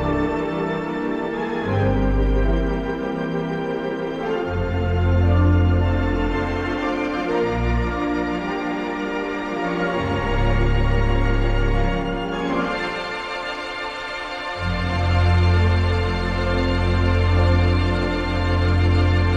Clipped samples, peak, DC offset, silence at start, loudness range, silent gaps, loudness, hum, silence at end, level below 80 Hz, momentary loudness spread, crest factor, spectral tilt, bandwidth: under 0.1%; -6 dBFS; under 0.1%; 0 s; 4 LU; none; -22 LUFS; none; 0 s; -26 dBFS; 7 LU; 14 dB; -7.5 dB/octave; 9 kHz